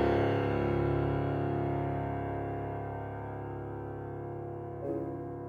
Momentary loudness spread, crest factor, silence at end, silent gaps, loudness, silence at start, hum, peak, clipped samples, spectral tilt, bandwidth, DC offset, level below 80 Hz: 10 LU; 16 dB; 0 s; none; -34 LUFS; 0 s; none; -16 dBFS; under 0.1%; -9.5 dB/octave; 6.4 kHz; under 0.1%; -48 dBFS